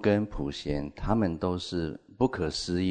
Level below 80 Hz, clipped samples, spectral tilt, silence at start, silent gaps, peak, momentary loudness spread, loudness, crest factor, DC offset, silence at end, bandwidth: -44 dBFS; under 0.1%; -6 dB/octave; 0 s; none; -10 dBFS; 6 LU; -30 LUFS; 18 dB; under 0.1%; 0 s; 9.4 kHz